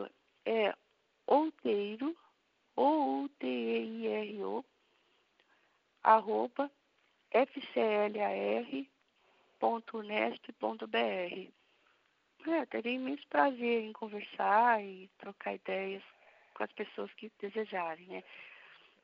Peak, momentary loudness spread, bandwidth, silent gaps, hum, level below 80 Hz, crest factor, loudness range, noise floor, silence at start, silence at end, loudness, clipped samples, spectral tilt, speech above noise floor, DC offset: -12 dBFS; 17 LU; 5.6 kHz; none; none; under -90 dBFS; 24 dB; 5 LU; -75 dBFS; 0 s; 0.5 s; -34 LUFS; under 0.1%; -2.5 dB/octave; 40 dB; under 0.1%